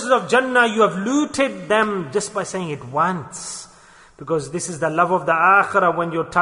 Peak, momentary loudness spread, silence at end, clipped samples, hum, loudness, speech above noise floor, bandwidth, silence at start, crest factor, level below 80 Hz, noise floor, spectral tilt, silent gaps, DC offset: -2 dBFS; 13 LU; 0 s; under 0.1%; none; -19 LUFS; 29 dB; 11 kHz; 0 s; 16 dB; -58 dBFS; -48 dBFS; -4 dB/octave; none; under 0.1%